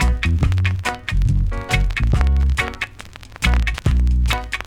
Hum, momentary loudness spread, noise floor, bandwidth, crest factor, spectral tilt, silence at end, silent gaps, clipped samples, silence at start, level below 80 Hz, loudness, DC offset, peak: none; 6 LU; -38 dBFS; 14.5 kHz; 14 dB; -5.5 dB/octave; 0.05 s; none; under 0.1%; 0 s; -20 dBFS; -20 LUFS; under 0.1%; -2 dBFS